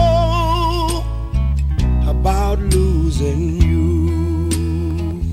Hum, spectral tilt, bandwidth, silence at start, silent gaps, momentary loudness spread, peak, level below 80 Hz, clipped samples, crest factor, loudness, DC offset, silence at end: none; -6.5 dB/octave; 14.5 kHz; 0 s; none; 5 LU; -2 dBFS; -18 dBFS; under 0.1%; 14 dB; -18 LUFS; under 0.1%; 0 s